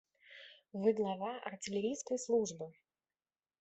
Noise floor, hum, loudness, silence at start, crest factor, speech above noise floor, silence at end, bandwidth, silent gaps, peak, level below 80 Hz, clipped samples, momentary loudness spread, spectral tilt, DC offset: under -90 dBFS; none; -37 LUFS; 0.3 s; 20 dB; over 53 dB; 0.9 s; 8.2 kHz; none; -20 dBFS; -80 dBFS; under 0.1%; 21 LU; -4.5 dB/octave; under 0.1%